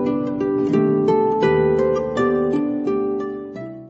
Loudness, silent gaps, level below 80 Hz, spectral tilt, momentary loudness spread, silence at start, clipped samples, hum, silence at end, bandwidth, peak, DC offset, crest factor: -19 LUFS; none; -48 dBFS; -8.5 dB/octave; 8 LU; 0 s; under 0.1%; none; 0 s; 7.6 kHz; -6 dBFS; under 0.1%; 14 dB